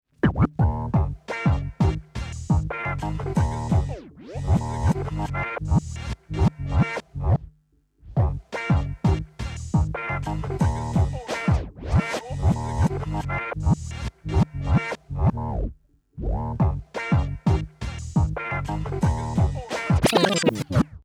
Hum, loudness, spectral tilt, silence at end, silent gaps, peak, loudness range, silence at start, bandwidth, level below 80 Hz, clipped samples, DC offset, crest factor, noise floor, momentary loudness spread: none; -25 LUFS; -6.5 dB/octave; 0.05 s; none; -6 dBFS; 2 LU; 0.25 s; 13.5 kHz; -32 dBFS; under 0.1%; under 0.1%; 18 dB; -63 dBFS; 8 LU